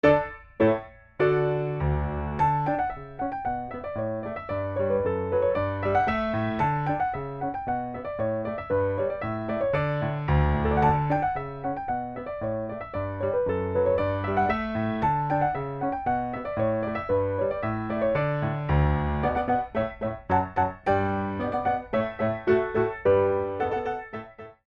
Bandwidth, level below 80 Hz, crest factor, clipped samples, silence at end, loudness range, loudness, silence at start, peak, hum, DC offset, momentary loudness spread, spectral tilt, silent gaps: 6.6 kHz; -40 dBFS; 20 dB; under 0.1%; 0.15 s; 3 LU; -27 LUFS; 0.05 s; -6 dBFS; none; under 0.1%; 8 LU; -9.5 dB/octave; none